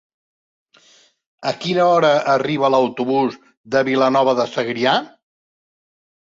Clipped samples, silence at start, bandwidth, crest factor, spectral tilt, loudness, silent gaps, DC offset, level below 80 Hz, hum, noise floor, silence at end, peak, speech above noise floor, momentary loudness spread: under 0.1%; 1.4 s; 7.6 kHz; 18 dB; -5.5 dB/octave; -18 LUFS; 3.57-3.64 s; under 0.1%; -66 dBFS; none; -54 dBFS; 1.15 s; -2 dBFS; 37 dB; 7 LU